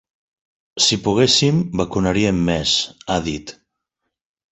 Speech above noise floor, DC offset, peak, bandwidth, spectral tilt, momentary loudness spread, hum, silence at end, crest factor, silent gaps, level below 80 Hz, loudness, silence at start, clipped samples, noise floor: 60 dB; under 0.1%; -2 dBFS; 8.2 kHz; -4 dB/octave; 13 LU; none; 1 s; 18 dB; none; -42 dBFS; -17 LUFS; 0.75 s; under 0.1%; -78 dBFS